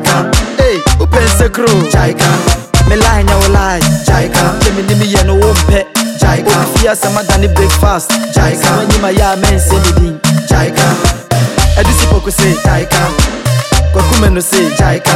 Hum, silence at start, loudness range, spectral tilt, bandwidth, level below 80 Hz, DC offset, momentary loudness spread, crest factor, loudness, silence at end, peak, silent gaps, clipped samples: none; 0 s; 1 LU; -4.5 dB/octave; 16.5 kHz; -14 dBFS; under 0.1%; 3 LU; 8 dB; -10 LUFS; 0 s; 0 dBFS; none; under 0.1%